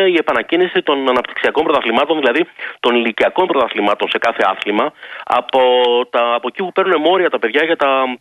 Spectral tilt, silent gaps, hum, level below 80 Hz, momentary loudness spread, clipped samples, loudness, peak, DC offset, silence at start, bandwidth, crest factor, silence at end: -5 dB/octave; none; none; -58 dBFS; 5 LU; under 0.1%; -15 LUFS; -2 dBFS; under 0.1%; 0 s; 11.5 kHz; 12 dB; 0.05 s